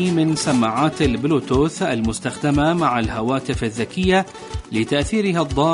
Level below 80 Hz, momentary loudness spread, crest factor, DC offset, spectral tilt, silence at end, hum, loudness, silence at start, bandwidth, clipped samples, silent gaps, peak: -36 dBFS; 6 LU; 14 dB; under 0.1%; -5.5 dB/octave; 0 s; none; -20 LUFS; 0 s; 11 kHz; under 0.1%; none; -4 dBFS